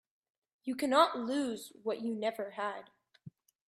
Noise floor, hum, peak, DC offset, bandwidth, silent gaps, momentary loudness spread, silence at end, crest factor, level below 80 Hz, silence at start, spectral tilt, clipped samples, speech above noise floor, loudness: -57 dBFS; none; -12 dBFS; under 0.1%; 15.5 kHz; none; 13 LU; 0.4 s; 24 dB; -82 dBFS; 0.65 s; -4 dB/octave; under 0.1%; 23 dB; -34 LUFS